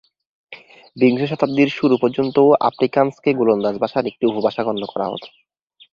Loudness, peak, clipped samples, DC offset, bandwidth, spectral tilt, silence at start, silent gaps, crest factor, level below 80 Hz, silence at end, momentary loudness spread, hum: -18 LUFS; -2 dBFS; under 0.1%; under 0.1%; 7 kHz; -8 dB/octave; 0.5 s; none; 18 dB; -62 dBFS; 0.65 s; 9 LU; none